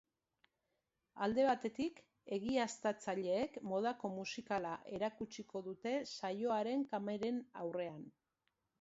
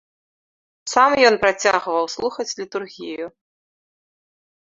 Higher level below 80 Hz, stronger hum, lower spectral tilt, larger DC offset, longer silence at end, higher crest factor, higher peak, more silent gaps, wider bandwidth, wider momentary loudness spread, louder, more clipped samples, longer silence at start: second, -76 dBFS vs -60 dBFS; neither; first, -4 dB/octave vs -2 dB/octave; neither; second, 0.7 s vs 1.4 s; about the same, 18 dB vs 20 dB; second, -22 dBFS vs -2 dBFS; neither; about the same, 7.6 kHz vs 7.8 kHz; second, 9 LU vs 18 LU; second, -40 LUFS vs -19 LUFS; neither; first, 1.15 s vs 0.85 s